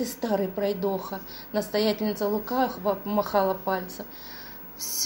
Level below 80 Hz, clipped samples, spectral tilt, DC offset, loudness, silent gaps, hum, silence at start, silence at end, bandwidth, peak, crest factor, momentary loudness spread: -56 dBFS; under 0.1%; -4 dB/octave; under 0.1%; -28 LUFS; none; none; 0 s; 0 s; 16.5 kHz; -10 dBFS; 18 dB; 13 LU